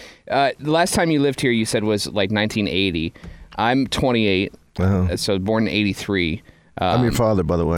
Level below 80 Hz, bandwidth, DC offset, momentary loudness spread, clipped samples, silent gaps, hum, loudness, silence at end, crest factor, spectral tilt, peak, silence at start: -40 dBFS; 16.5 kHz; under 0.1%; 7 LU; under 0.1%; none; none; -20 LUFS; 0 s; 14 dB; -5 dB/octave; -4 dBFS; 0 s